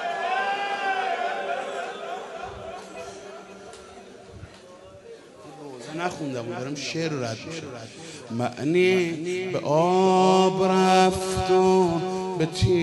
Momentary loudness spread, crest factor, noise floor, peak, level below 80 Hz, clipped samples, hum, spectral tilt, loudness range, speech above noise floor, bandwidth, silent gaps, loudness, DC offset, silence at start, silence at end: 24 LU; 18 dB; -46 dBFS; -6 dBFS; -50 dBFS; under 0.1%; none; -5.5 dB/octave; 18 LU; 24 dB; 11.5 kHz; none; -24 LUFS; under 0.1%; 0 s; 0 s